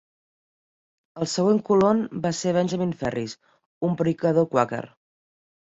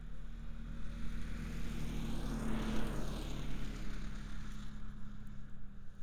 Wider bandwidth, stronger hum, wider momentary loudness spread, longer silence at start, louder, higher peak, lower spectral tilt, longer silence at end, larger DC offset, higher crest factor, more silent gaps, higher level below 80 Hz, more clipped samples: second, 8 kHz vs 15 kHz; neither; about the same, 13 LU vs 12 LU; first, 1.15 s vs 0 s; first, -24 LUFS vs -45 LUFS; first, -4 dBFS vs -24 dBFS; about the same, -6 dB/octave vs -6 dB/octave; first, 0.95 s vs 0 s; neither; first, 20 dB vs 14 dB; first, 3.66-3.81 s vs none; second, -60 dBFS vs -44 dBFS; neither